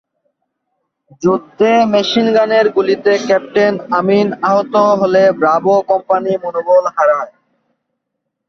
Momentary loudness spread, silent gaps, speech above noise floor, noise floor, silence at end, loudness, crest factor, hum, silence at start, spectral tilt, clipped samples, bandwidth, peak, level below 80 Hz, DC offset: 5 LU; none; 62 dB; -74 dBFS; 1.2 s; -13 LUFS; 12 dB; none; 1.2 s; -5.5 dB/octave; under 0.1%; 7 kHz; -2 dBFS; -58 dBFS; under 0.1%